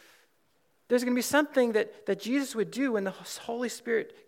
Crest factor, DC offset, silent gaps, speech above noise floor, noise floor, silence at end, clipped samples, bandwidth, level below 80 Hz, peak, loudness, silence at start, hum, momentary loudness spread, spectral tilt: 20 dB; under 0.1%; none; 43 dB; -72 dBFS; 0.15 s; under 0.1%; 17 kHz; -80 dBFS; -10 dBFS; -29 LUFS; 0.9 s; none; 8 LU; -4 dB/octave